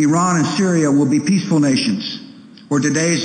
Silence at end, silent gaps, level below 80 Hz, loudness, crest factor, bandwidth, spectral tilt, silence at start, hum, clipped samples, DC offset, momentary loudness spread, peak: 0 s; none; -60 dBFS; -16 LUFS; 10 dB; 9.4 kHz; -5 dB/octave; 0 s; none; under 0.1%; under 0.1%; 8 LU; -6 dBFS